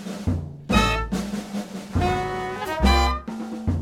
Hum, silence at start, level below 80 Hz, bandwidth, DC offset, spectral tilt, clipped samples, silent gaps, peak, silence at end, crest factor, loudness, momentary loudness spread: none; 0 s; -30 dBFS; 16 kHz; under 0.1%; -5.5 dB/octave; under 0.1%; none; -4 dBFS; 0 s; 18 dB; -24 LUFS; 10 LU